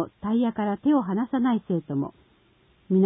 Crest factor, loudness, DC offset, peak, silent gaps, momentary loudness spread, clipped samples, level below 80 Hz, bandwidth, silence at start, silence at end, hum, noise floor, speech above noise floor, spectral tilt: 14 dB; -25 LUFS; under 0.1%; -12 dBFS; none; 7 LU; under 0.1%; -62 dBFS; 3.9 kHz; 0 s; 0 s; none; -61 dBFS; 36 dB; -12.5 dB/octave